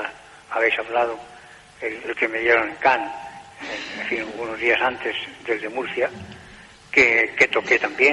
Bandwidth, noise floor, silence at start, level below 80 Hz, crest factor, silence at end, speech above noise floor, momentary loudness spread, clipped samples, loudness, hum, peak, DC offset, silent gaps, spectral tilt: 11.5 kHz; -45 dBFS; 0 s; -58 dBFS; 20 dB; 0 s; 24 dB; 16 LU; under 0.1%; -21 LUFS; none; -2 dBFS; under 0.1%; none; -3.5 dB/octave